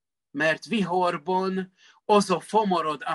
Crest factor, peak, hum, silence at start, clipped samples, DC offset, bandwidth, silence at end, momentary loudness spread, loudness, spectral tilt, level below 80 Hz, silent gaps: 18 dB; -6 dBFS; none; 0.35 s; under 0.1%; under 0.1%; 12 kHz; 0 s; 13 LU; -25 LUFS; -5 dB/octave; -72 dBFS; none